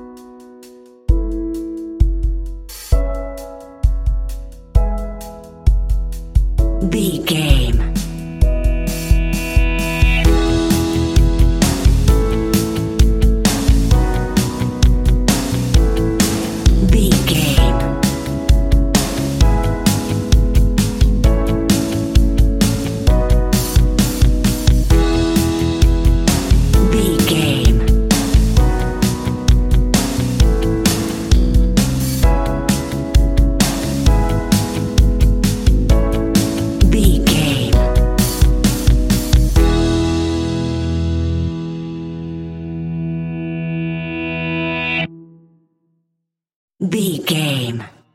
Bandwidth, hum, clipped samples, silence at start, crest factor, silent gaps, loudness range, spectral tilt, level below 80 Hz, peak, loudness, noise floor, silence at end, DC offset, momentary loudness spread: 16.5 kHz; none; under 0.1%; 0 s; 14 dB; 46.56-46.68 s; 7 LU; -5.5 dB/octave; -16 dBFS; 0 dBFS; -16 LUFS; -75 dBFS; 0.25 s; under 0.1%; 9 LU